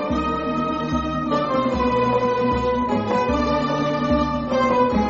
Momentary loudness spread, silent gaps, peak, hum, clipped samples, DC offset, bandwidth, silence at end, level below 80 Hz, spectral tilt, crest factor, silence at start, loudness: 4 LU; none; -8 dBFS; none; under 0.1%; under 0.1%; 7.6 kHz; 0 s; -36 dBFS; -5 dB/octave; 12 dB; 0 s; -21 LUFS